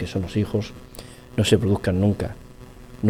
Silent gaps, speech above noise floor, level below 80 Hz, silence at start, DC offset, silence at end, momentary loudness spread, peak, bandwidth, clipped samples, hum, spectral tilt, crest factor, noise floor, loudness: none; 20 dB; -44 dBFS; 0 s; under 0.1%; 0 s; 21 LU; -4 dBFS; 15.5 kHz; under 0.1%; none; -6.5 dB/octave; 20 dB; -42 dBFS; -23 LUFS